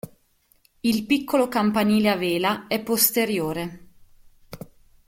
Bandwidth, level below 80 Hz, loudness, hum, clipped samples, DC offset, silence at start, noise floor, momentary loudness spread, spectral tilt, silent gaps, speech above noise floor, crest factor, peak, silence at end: 16.5 kHz; -56 dBFS; -22 LUFS; none; under 0.1%; under 0.1%; 0.05 s; -63 dBFS; 19 LU; -4 dB/octave; none; 41 dB; 22 dB; -2 dBFS; 0.5 s